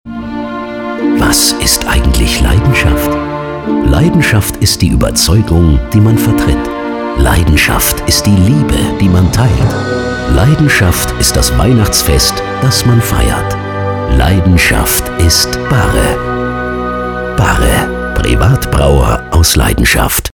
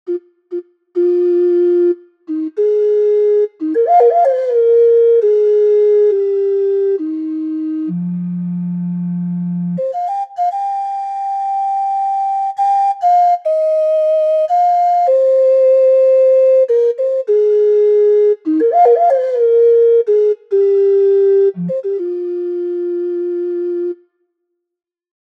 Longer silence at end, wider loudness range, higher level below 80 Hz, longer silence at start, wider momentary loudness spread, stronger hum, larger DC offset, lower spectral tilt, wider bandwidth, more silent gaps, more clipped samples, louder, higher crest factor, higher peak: second, 0.05 s vs 1.4 s; second, 2 LU vs 8 LU; first, -16 dBFS vs -84 dBFS; about the same, 0.05 s vs 0.05 s; about the same, 8 LU vs 10 LU; neither; neither; second, -4.5 dB/octave vs -9.5 dB/octave; first, 20 kHz vs 6 kHz; neither; neither; first, -10 LUFS vs -14 LUFS; about the same, 10 dB vs 10 dB; about the same, 0 dBFS vs -2 dBFS